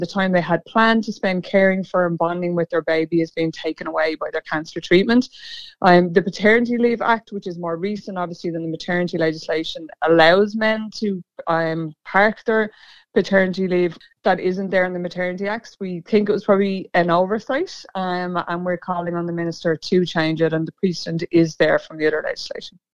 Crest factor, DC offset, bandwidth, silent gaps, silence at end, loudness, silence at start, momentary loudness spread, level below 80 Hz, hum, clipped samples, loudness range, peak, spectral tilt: 20 dB; 0.4%; 8 kHz; none; 0.25 s; -20 LUFS; 0 s; 11 LU; -58 dBFS; none; under 0.1%; 4 LU; 0 dBFS; -6.5 dB/octave